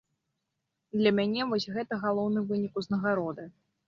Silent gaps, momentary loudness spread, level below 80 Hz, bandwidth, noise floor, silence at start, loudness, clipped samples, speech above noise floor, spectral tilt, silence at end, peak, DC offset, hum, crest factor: none; 10 LU; -70 dBFS; 7.2 kHz; -83 dBFS; 0.95 s; -30 LUFS; under 0.1%; 54 dB; -7 dB/octave; 0.35 s; -12 dBFS; under 0.1%; none; 20 dB